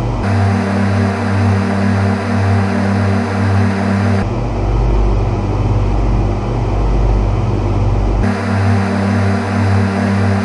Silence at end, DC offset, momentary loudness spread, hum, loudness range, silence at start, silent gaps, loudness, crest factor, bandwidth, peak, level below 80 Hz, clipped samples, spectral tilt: 0 s; under 0.1%; 3 LU; none; 2 LU; 0 s; none; -15 LUFS; 12 dB; 11 kHz; -2 dBFS; -20 dBFS; under 0.1%; -8 dB/octave